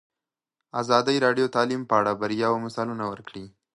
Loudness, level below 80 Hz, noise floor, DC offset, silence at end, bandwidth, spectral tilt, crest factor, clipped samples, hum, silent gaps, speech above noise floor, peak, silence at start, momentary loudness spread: -24 LUFS; -66 dBFS; -89 dBFS; under 0.1%; 0.25 s; 11.5 kHz; -5 dB/octave; 22 dB; under 0.1%; none; none; 65 dB; -4 dBFS; 0.75 s; 13 LU